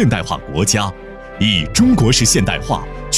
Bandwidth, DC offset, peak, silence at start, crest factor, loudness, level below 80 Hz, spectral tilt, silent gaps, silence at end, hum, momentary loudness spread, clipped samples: 16 kHz; under 0.1%; -2 dBFS; 0 s; 14 dB; -15 LUFS; -30 dBFS; -4 dB/octave; none; 0 s; none; 11 LU; under 0.1%